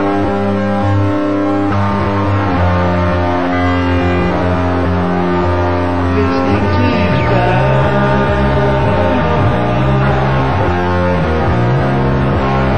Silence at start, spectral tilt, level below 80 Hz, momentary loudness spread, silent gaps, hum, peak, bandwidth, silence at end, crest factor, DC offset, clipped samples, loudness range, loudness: 0 s; -8 dB/octave; -26 dBFS; 2 LU; none; none; 0 dBFS; 8.8 kHz; 0 s; 12 dB; 6%; under 0.1%; 2 LU; -13 LUFS